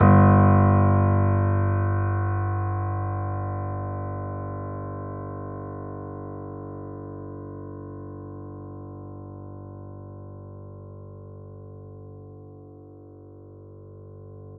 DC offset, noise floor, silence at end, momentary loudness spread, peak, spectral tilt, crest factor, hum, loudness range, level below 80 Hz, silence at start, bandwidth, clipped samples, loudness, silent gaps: under 0.1%; -45 dBFS; 0 s; 25 LU; -4 dBFS; -11 dB/octave; 22 dB; 50 Hz at -80 dBFS; 20 LU; -52 dBFS; 0 s; 2.6 kHz; under 0.1%; -24 LUFS; none